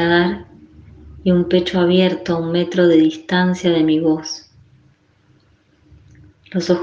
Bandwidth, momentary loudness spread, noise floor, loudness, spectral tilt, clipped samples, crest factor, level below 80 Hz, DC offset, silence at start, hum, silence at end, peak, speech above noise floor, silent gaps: 7.4 kHz; 10 LU; -55 dBFS; -17 LUFS; -6.5 dB/octave; under 0.1%; 16 dB; -48 dBFS; under 0.1%; 0 s; none; 0 s; -2 dBFS; 40 dB; none